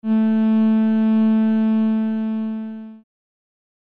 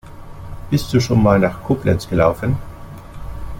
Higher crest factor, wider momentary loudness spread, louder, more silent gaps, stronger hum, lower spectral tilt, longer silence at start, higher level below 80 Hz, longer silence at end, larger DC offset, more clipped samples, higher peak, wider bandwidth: second, 8 dB vs 16 dB; second, 11 LU vs 22 LU; about the same, -18 LUFS vs -17 LUFS; neither; neither; first, -10 dB/octave vs -7 dB/octave; about the same, 0.05 s vs 0.05 s; second, -72 dBFS vs -34 dBFS; first, 0.95 s vs 0 s; neither; neither; second, -10 dBFS vs -2 dBFS; second, 4 kHz vs 17 kHz